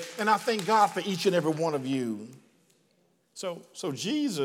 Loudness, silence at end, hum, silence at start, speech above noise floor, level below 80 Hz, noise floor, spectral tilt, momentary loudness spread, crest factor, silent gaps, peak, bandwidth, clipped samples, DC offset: -28 LUFS; 0 s; none; 0 s; 41 dB; -88 dBFS; -69 dBFS; -4.5 dB/octave; 14 LU; 20 dB; none; -10 dBFS; 17 kHz; under 0.1%; under 0.1%